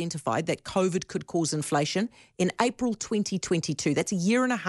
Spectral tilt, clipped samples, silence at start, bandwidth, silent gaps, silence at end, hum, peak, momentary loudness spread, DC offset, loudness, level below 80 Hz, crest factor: -4.5 dB/octave; under 0.1%; 0 s; 11.5 kHz; none; 0 s; none; -8 dBFS; 5 LU; under 0.1%; -28 LUFS; -62 dBFS; 18 dB